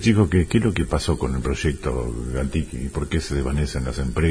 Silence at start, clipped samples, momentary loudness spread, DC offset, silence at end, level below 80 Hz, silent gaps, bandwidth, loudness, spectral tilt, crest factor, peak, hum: 0 s; under 0.1%; 8 LU; under 0.1%; 0 s; -30 dBFS; none; 11 kHz; -23 LUFS; -6.5 dB/octave; 16 dB; -4 dBFS; none